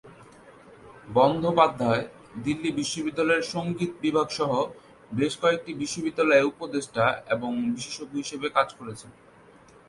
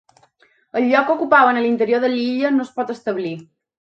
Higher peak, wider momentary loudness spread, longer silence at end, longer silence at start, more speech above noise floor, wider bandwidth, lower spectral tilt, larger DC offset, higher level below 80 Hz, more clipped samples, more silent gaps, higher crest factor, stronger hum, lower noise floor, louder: second, -4 dBFS vs 0 dBFS; about the same, 11 LU vs 13 LU; first, 0.75 s vs 0.35 s; second, 0.05 s vs 0.75 s; second, 27 dB vs 40 dB; first, 11.5 kHz vs 7.8 kHz; about the same, -5 dB/octave vs -6 dB/octave; neither; first, -62 dBFS vs -70 dBFS; neither; neither; about the same, 22 dB vs 18 dB; neither; second, -53 dBFS vs -57 dBFS; second, -26 LUFS vs -18 LUFS